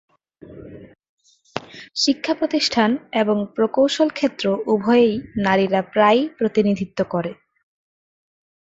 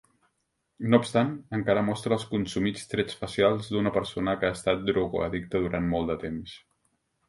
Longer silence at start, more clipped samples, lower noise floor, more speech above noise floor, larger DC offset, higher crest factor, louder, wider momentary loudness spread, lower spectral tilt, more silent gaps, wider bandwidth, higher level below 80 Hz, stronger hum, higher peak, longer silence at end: second, 0.5 s vs 0.8 s; neither; second, -44 dBFS vs -77 dBFS; second, 25 dB vs 50 dB; neither; second, 18 dB vs 24 dB; first, -19 LUFS vs -27 LUFS; first, 15 LU vs 7 LU; about the same, -5 dB/octave vs -6 dB/octave; first, 1.09-1.18 s vs none; second, 8 kHz vs 11.5 kHz; about the same, -56 dBFS vs -52 dBFS; neither; about the same, -2 dBFS vs -4 dBFS; first, 1.3 s vs 0.7 s